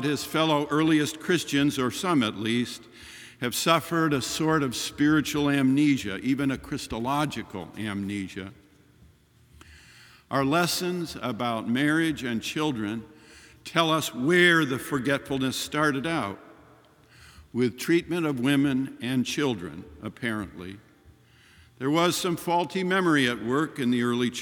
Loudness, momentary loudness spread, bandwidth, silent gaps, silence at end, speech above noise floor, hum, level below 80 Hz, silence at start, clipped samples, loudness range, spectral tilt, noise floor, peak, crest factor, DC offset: -26 LUFS; 12 LU; 19 kHz; none; 0 s; 32 dB; none; -58 dBFS; 0 s; under 0.1%; 6 LU; -4.5 dB/octave; -58 dBFS; -6 dBFS; 22 dB; under 0.1%